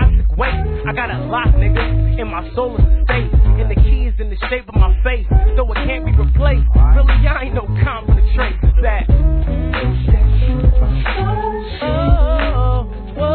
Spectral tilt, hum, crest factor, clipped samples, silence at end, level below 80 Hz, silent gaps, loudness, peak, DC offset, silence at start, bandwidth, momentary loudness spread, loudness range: -11 dB/octave; none; 12 dB; under 0.1%; 0 s; -14 dBFS; none; -16 LUFS; 0 dBFS; 0.2%; 0 s; 4.4 kHz; 7 LU; 2 LU